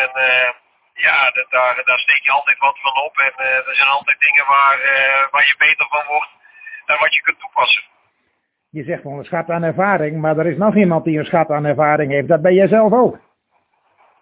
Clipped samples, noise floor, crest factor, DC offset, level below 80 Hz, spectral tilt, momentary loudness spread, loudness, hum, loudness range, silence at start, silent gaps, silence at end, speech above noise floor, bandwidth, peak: under 0.1%; -69 dBFS; 16 dB; under 0.1%; -60 dBFS; -8.5 dB/octave; 9 LU; -14 LUFS; none; 6 LU; 0 s; none; 1.05 s; 53 dB; 4 kHz; 0 dBFS